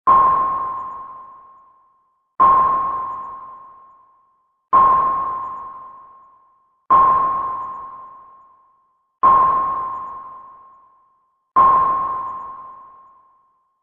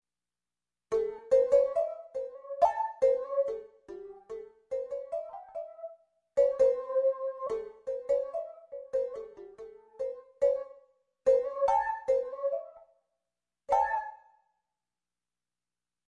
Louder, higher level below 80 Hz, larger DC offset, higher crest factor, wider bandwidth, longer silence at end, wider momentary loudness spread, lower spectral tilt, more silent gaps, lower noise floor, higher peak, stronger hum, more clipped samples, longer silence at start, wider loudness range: first, -17 LUFS vs -30 LUFS; first, -52 dBFS vs -68 dBFS; neither; about the same, 18 dB vs 20 dB; second, 3.6 kHz vs 7.6 kHz; second, 1 s vs 1.95 s; first, 23 LU vs 19 LU; first, -8 dB/octave vs -4.5 dB/octave; neither; second, -63 dBFS vs under -90 dBFS; first, -2 dBFS vs -12 dBFS; second, none vs 60 Hz at -90 dBFS; neither; second, 0.05 s vs 0.9 s; second, 3 LU vs 7 LU